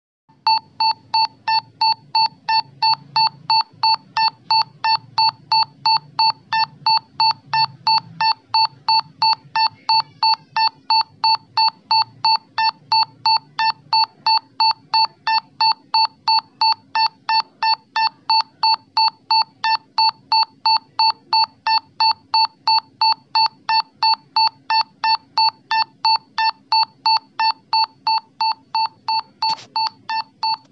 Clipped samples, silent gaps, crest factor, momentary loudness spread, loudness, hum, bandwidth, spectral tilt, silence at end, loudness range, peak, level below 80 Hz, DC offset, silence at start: under 0.1%; none; 14 dB; 4 LU; -18 LUFS; none; 6.6 kHz; -1 dB/octave; 0.15 s; 1 LU; -6 dBFS; -84 dBFS; under 0.1%; 0.45 s